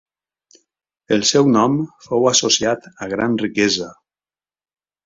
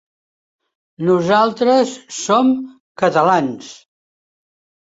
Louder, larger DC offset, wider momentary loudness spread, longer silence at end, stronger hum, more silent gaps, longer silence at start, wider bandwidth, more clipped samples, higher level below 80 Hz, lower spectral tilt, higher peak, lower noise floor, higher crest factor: about the same, -17 LUFS vs -16 LUFS; neither; second, 9 LU vs 12 LU; about the same, 1.15 s vs 1.15 s; neither; second, none vs 2.80-2.95 s; about the same, 1.1 s vs 1 s; about the same, 7.8 kHz vs 8 kHz; neither; about the same, -58 dBFS vs -62 dBFS; second, -3.5 dB/octave vs -5 dB/octave; about the same, -2 dBFS vs -2 dBFS; about the same, under -90 dBFS vs under -90 dBFS; about the same, 18 dB vs 16 dB